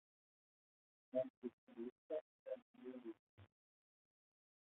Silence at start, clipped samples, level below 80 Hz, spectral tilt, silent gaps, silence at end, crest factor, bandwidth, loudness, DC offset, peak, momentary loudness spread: 1.15 s; under 0.1%; under -90 dBFS; -4.5 dB/octave; 1.30-1.42 s, 1.53-1.67 s, 1.92-2.10 s, 2.21-2.46 s, 2.62-2.74 s, 3.19-3.38 s; 1.2 s; 24 dB; 3.9 kHz; -51 LUFS; under 0.1%; -30 dBFS; 11 LU